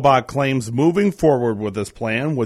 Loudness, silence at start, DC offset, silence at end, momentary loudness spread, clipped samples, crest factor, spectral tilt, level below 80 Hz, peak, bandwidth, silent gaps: -19 LUFS; 0 s; under 0.1%; 0 s; 8 LU; under 0.1%; 16 dB; -6.5 dB/octave; -48 dBFS; -2 dBFS; 15 kHz; none